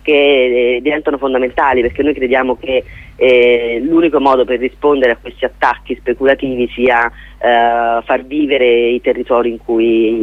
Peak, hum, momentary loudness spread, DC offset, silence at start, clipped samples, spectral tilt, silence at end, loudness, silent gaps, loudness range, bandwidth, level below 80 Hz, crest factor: 0 dBFS; none; 7 LU; under 0.1%; 0.05 s; under 0.1%; -6.5 dB/octave; 0 s; -13 LUFS; none; 2 LU; 5.6 kHz; -40 dBFS; 12 dB